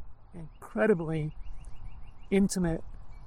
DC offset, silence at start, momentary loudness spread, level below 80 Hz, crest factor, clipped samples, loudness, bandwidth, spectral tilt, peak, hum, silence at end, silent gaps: under 0.1%; 0 s; 24 LU; -44 dBFS; 18 dB; under 0.1%; -30 LUFS; 15.5 kHz; -6.5 dB/octave; -12 dBFS; none; 0 s; none